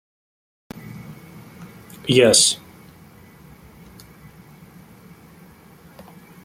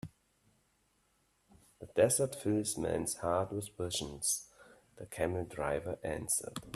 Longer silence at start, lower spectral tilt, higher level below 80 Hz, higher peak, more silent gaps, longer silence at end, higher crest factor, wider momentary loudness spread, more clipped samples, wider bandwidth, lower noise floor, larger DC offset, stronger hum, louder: first, 0.75 s vs 0.05 s; second, -2.5 dB/octave vs -4 dB/octave; about the same, -58 dBFS vs -62 dBFS; first, -2 dBFS vs -16 dBFS; neither; first, 3.9 s vs 0 s; about the same, 24 dB vs 22 dB; first, 29 LU vs 10 LU; neither; about the same, 16.5 kHz vs 15 kHz; second, -47 dBFS vs -75 dBFS; neither; neither; first, -16 LUFS vs -35 LUFS